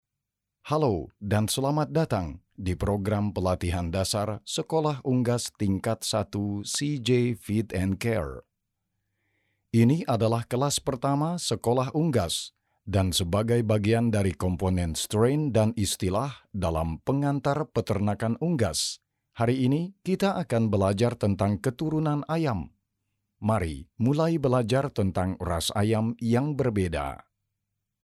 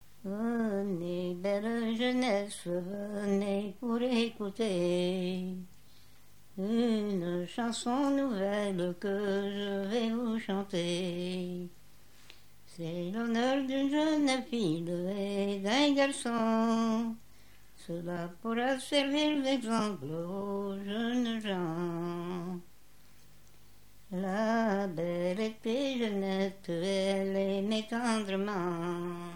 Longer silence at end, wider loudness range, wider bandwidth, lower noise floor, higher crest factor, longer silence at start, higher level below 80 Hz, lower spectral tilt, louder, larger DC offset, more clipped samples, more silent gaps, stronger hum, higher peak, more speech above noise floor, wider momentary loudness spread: first, 0.9 s vs 0 s; second, 2 LU vs 5 LU; about the same, 15 kHz vs 16.5 kHz; first, -85 dBFS vs -62 dBFS; about the same, 16 dB vs 18 dB; first, 0.65 s vs 0.25 s; first, -48 dBFS vs -68 dBFS; about the same, -6 dB/octave vs -5.5 dB/octave; first, -27 LUFS vs -33 LUFS; second, under 0.1% vs 0.3%; neither; neither; second, none vs 50 Hz at -65 dBFS; first, -10 dBFS vs -14 dBFS; first, 59 dB vs 30 dB; second, 6 LU vs 9 LU